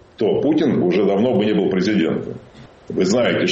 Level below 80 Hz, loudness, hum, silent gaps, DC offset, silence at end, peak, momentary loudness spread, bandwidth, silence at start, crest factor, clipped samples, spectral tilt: -54 dBFS; -18 LUFS; none; none; under 0.1%; 0 s; -8 dBFS; 10 LU; 8 kHz; 0.2 s; 10 dB; under 0.1%; -6 dB/octave